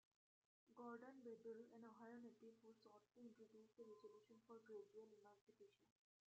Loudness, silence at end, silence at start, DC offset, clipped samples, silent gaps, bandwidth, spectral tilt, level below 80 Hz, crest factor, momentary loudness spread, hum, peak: -63 LUFS; 0.45 s; 0.65 s; under 0.1%; under 0.1%; 5.41-5.47 s; 7.6 kHz; -5 dB/octave; under -90 dBFS; 18 dB; 9 LU; none; -46 dBFS